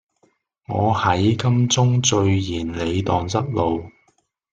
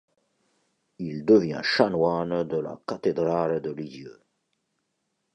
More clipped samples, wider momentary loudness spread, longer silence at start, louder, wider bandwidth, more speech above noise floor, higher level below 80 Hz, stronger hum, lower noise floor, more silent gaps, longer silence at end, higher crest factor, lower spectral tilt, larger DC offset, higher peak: neither; second, 7 LU vs 16 LU; second, 0.7 s vs 1 s; first, -20 LUFS vs -25 LUFS; about the same, 9.2 kHz vs 8.6 kHz; second, 46 dB vs 52 dB; first, -48 dBFS vs -62 dBFS; neither; second, -65 dBFS vs -77 dBFS; neither; second, 0.65 s vs 1.2 s; about the same, 18 dB vs 22 dB; second, -5 dB/octave vs -6.5 dB/octave; neither; about the same, -4 dBFS vs -4 dBFS